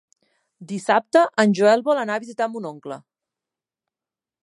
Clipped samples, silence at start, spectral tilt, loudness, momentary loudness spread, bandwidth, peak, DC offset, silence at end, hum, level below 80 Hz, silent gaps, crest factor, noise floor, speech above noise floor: under 0.1%; 0.6 s; -5.5 dB/octave; -20 LUFS; 18 LU; 11.5 kHz; -2 dBFS; under 0.1%; 1.45 s; none; -76 dBFS; none; 20 dB; under -90 dBFS; over 70 dB